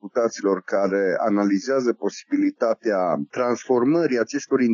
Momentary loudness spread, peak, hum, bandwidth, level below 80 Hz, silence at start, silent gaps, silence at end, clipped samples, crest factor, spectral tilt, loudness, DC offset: 4 LU; -6 dBFS; none; 7.2 kHz; -80 dBFS; 0.05 s; none; 0 s; under 0.1%; 14 dB; -6 dB/octave; -22 LUFS; under 0.1%